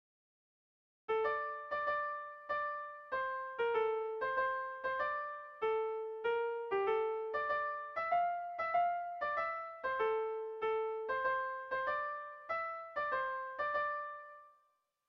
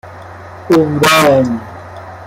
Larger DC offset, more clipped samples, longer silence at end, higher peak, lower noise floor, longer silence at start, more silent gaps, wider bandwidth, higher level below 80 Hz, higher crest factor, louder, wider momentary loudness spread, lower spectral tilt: neither; neither; first, 0.6 s vs 0 s; second, -22 dBFS vs 0 dBFS; first, -77 dBFS vs -31 dBFS; first, 1.1 s vs 0.05 s; neither; second, 5.8 kHz vs 16.5 kHz; second, -74 dBFS vs -48 dBFS; about the same, 16 dB vs 14 dB; second, -37 LUFS vs -11 LUFS; second, 7 LU vs 23 LU; about the same, -5 dB/octave vs -4.5 dB/octave